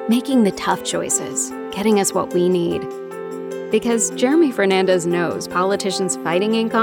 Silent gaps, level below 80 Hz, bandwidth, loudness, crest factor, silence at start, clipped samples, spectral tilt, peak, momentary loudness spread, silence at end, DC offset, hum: none; -58 dBFS; 18 kHz; -19 LUFS; 16 dB; 0 s; under 0.1%; -4 dB/octave; -4 dBFS; 9 LU; 0 s; under 0.1%; none